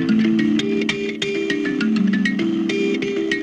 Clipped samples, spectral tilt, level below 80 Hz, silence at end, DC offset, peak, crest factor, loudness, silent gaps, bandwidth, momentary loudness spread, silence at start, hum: under 0.1%; -5.5 dB/octave; -56 dBFS; 0 s; under 0.1%; -6 dBFS; 14 dB; -20 LUFS; none; 9.2 kHz; 5 LU; 0 s; none